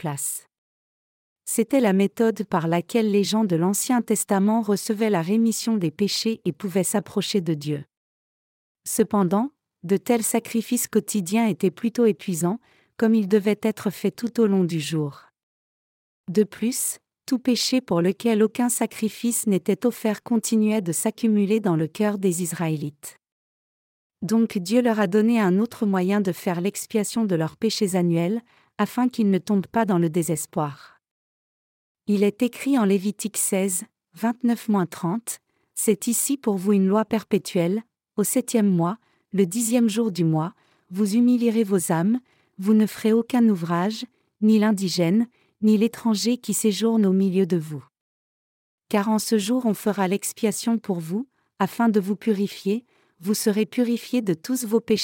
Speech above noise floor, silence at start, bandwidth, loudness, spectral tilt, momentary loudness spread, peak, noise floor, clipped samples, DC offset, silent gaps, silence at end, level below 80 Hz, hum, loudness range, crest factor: over 68 dB; 0.05 s; 17 kHz; -23 LUFS; -5 dB/octave; 8 LU; -6 dBFS; under -90 dBFS; under 0.1%; under 0.1%; 0.58-1.36 s, 7.97-8.75 s, 15.43-16.24 s, 23.32-24.10 s, 31.11-31.95 s, 48.01-48.78 s; 0 s; -72 dBFS; none; 4 LU; 16 dB